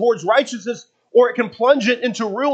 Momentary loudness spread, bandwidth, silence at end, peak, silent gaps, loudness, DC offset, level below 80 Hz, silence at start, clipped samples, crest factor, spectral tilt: 12 LU; 8.4 kHz; 0 s; 0 dBFS; none; -18 LUFS; under 0.1%; -76 dBFS; 0 s; under 0.1%; 18 dB; -4 dB/octave